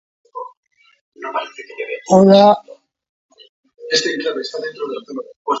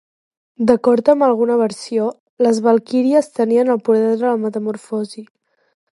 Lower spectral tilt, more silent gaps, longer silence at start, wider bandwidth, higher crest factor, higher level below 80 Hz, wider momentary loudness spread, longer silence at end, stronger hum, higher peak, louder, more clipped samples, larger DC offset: about the same, -5 dB/octave vs -6 dB/octave; first, 0.57-0.63 s, 1.01-1.12 s, 3.09-3.29 s, 3.49-3.64 s, 5.36-5.45 s vs 2.20-2.37 s; second, 0.35 s vs 0.6 s; second, 8 kHz vs 11.5 kHz; about the same, 18 dB vs 16 dB; about the same, -62 dBFS vs -62 dBFS; first, 23 LU vs 11 LU; second, 0 s vs 0.7 s; neither; about the same, 0 dBFS vs 0 dBFS; about the same, -16 LUFS vs -16 LUFS; neither; neither